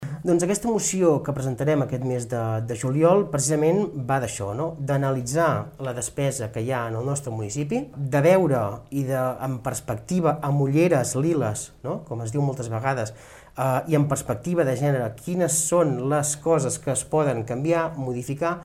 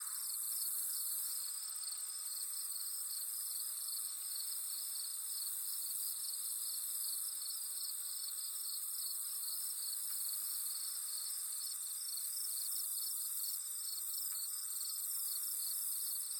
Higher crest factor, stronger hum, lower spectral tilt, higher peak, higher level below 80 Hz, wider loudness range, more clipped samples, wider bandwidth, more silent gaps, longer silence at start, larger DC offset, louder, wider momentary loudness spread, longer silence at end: about the same, 18 dB vs 16 dB; neither; first, -6 dB/octave vs 6.5 dB/octave; first, -6 dBFS vs -26 dBFS; first, -52 dBFS vs under -90 dBFS; about the same, 3 LU vs 1 LU; neither; second, 15.5 kHz vs 19 kHz; neither; about the same, 0 s vs 0 s; neither; first, -24 LUFS vs -38 LUFS; first, 9 LU vs 3 LU; about the same, 0 s vs 0 s